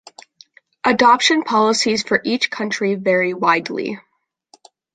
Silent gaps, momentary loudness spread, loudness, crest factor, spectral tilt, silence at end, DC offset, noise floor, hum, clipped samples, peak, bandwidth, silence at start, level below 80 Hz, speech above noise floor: none; 11 LU; -17 LUFS; 18 dB; -3 dB/octave; 0.95 s; under 0.1%; -55 dBFS; none; under 0.1%; -2 dBFS; 9.6 kHz; 0.85 s; -62 dBFS; 38 dB